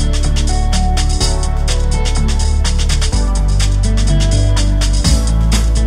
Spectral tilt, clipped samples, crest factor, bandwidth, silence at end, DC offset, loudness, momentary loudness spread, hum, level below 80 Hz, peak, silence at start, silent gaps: -4.5 dB/octave; under 0.1%; 12 dB; 12.5 kHz; 0 s; 1%; -15 LUFS; 3 LU; none; -12 dBFS; 0 dBFS; 0 s; none